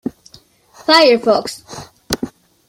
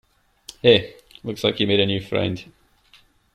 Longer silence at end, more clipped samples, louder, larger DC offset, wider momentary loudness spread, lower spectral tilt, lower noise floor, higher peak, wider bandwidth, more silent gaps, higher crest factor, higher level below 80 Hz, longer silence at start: second, 0.4 s vs 0.9 s; neither; first, -14 LUFS vs -20 LUFS; neither; first, 22 LU vs 19 LU; second, -3 dB/octave vs -5.5 dB/octave; second, -47 dBFS vs -56 dBFS; about the same, 0 dBFS vs -2 dBFS; first, 16.5 kHz vs 14 kHz; neither; about the same, 18 dB vs 22 dB; first, -50 dBFS vs -56 dBFS; second, 0.05 s vs 0.65 s